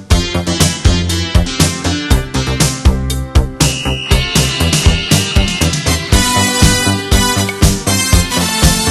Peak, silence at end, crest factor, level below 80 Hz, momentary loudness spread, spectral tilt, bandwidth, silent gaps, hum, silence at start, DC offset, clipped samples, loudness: 0 dBFS; 0 s; 12 dB; -18 dBFS; 4 LU; -3.5 dB/octave; 13.5 kHz; none; none; 0 s; under 0.1%; 0.4%; -12 LUFS